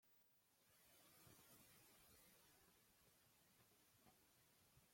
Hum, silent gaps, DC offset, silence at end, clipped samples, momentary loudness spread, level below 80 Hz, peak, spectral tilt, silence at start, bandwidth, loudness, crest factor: none; none; under 0.1%; 0 s; under 0.1%; 2 LU; under -90 dBFS; -54 dBFS; -2.5 dB/octave; 0 s; 16.5 kHz; -69 LUFS; 20 dB